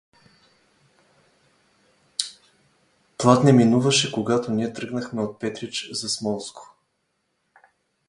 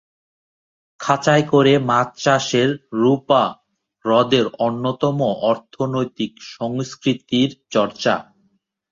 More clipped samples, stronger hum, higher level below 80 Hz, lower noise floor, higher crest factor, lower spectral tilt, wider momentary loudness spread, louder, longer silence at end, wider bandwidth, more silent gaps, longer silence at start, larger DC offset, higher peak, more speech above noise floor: neither; neither; about the same, -64 dBFS vs -60 dBFS; first, -73 dBFS vs -65 dBFS; first, 24 dB vs 18 dB; about the same, -5 dB/octave vs -5.5 dB/octave; first, 15 LU vs 10 LU; second, -22 LUFS vs -19 LUFS; first, 1.45 s vs 0.7 s; first, 11.5 kHz vs 7.8 kHz; neither; first, 2.2 s vs 1 s; neither; about the same, 0 dBFS vs -2 dBFS; first, 52 dB vs 47 dB